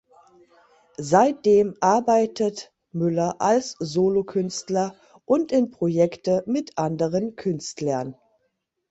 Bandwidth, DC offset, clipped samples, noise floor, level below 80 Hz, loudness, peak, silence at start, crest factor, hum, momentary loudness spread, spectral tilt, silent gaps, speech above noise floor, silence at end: 8.2 kHz; under 0.1%; under 0.1%; -74 dBFS; -62 dBFS; -23 LUFS; -4 dBFS; 1 s; 20 dB; none; 9 LU; -6 dB/octave; none; 52 dB; 0.75 s